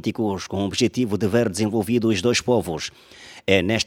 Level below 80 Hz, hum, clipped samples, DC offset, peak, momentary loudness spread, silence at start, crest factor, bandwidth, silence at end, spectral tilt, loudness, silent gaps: -52 dBFS; none; under 0.1%; under 0.1%; 0 dBFS; 10 LU; 0.05 s; 22 dB; 17.5 kHz; 0 s; -5 dB/octave; -22 LUFS; none